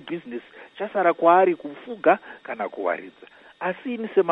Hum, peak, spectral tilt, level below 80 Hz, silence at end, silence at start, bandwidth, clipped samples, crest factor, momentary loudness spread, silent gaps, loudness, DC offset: none; -4 dBFS; -8.5 dB/octave; -76 dBFS; 0 s; 0.05 s; 4.1 kHz; under 0.1%; 20 dB; 18 LU; none; -23 LUFS; under 0.1%